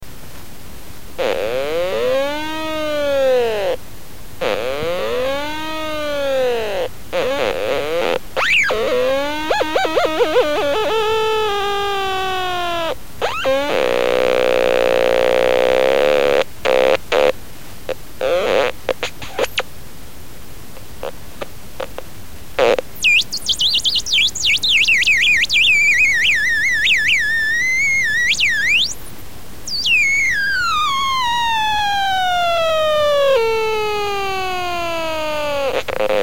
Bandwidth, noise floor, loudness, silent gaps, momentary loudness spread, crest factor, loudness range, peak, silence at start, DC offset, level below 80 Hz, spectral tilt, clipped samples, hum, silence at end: 17 kHz; -37 dBFS; -16 LUFS; none; 12 LU; 18 dB; 9 LU; 0 dBFS; 0 s; 4%; -42 dBFS; -2 dB/octave; under 0.1%; none; 0 s